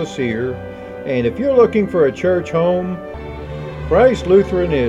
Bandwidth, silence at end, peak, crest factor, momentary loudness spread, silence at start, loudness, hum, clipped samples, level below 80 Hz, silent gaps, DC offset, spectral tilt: 9.8 kHz; 0 s; -2 dBFS; 16 dB; 16 LU; 0 s; -16 LUFS; none; under 0.1%; -36 dBFS; none; under 0.1%; -7.5 dB/octave